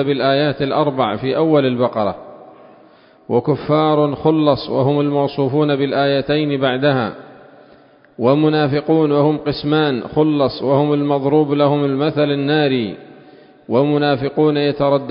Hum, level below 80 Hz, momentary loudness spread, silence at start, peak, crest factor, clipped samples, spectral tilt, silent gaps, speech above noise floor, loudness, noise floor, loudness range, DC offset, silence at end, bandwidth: none; -52 dBFS; 5 LU; 0 s; 0 dBFS; 16 dB; under 0.1%; -12 dB/octave; none; 32 dB; -16 LUFS; -48 dBFS; 2 LU; under 0.1%; 0 s; 5.4 kHz